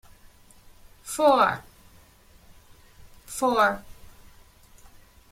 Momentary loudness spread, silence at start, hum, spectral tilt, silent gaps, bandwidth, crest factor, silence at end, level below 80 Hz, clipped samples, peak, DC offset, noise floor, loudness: 18 LU; 1.05 s; none; -3.5 dB/octave; none; 16.5 kHz; 22 dB; 1.4 s; -56 dBFS; under 0.1%; -6 dBFS; under 0.1%; -54 dBFS; -23 LUFS